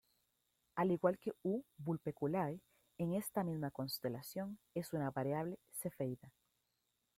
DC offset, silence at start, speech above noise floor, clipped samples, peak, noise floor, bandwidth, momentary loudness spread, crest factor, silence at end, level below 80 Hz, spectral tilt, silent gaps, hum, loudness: under 0.1%; 0.75 s; 44 dB; under 0.1%; -20 dBFS; -85 dBFS; 16.5 kHz; 8 LU; 22 dB; 0.9 s; -76 dBFS; -6.5 dB/octave; none; none; -41 LUFS